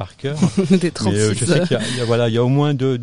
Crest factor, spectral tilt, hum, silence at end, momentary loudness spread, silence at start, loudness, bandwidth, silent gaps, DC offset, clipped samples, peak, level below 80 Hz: 14 dB; -6 dB/octave; none; 0 s; 3 LU; 0 s; -17 LUFS; 11 kHz; none; 1%; under 0.1%; -2 dBFS; -48 dBFS